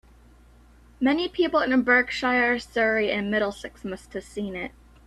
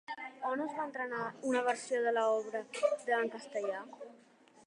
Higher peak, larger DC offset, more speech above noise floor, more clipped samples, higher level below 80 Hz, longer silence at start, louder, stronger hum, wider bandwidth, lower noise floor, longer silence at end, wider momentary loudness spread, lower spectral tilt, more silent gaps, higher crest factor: first, -6 dBFS vs -18 dBFS; neither; about the same, 29 dB vs 28 dB; neither; first, -52 dBFS vs under -90 dBFS; first, 1 s vs 0.1 s; first, -23 LUFS vs -35 LUFS; neither; about the same, 12 kHz vs 11 kHz; second, -53 dBFS vs -63 dBFS; about the same, 0.4 s vs 0.5 s; first, 15 LU vs 12 LU; first, -5 dB/octave vs -3.5 dB/octave; neither; about the same, 20 dB vs 18 dB